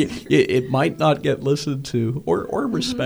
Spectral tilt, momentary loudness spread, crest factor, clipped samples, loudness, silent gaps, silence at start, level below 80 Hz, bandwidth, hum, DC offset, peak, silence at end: -6 dB/octave; 6 LU; 18 dB; under 0.1%; -21 LUFS; none; 0 s; -50 dBFS; over 20 kHz; none; under 0.1%; -2 dBFS; 0 s